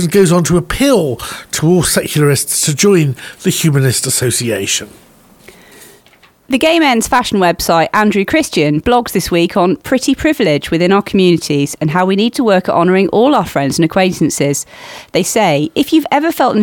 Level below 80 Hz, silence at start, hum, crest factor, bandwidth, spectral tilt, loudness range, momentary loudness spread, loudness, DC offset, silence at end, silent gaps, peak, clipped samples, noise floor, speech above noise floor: -38 dBFS; 0 s; none; 12 dB; 19 kHz; -4.5 dB/octave; 3 LU; 5 LU; -12 LUFS; under 0.1%; 0 s; none; 0 dBFS; under 0.1%; -47 dBFS; 35 dB